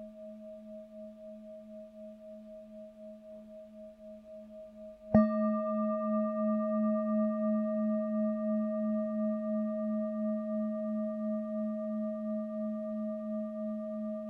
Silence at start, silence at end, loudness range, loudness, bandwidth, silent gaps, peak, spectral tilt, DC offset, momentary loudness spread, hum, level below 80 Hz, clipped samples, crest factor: 0 s; 0 s; 18 LU; -33 LUFS; 2.8 kHz; none; -12 dBFS; -11 dB/octave; under 0.1%; 19 LU; none; -66 dBFS; under 0.1%; 24 dB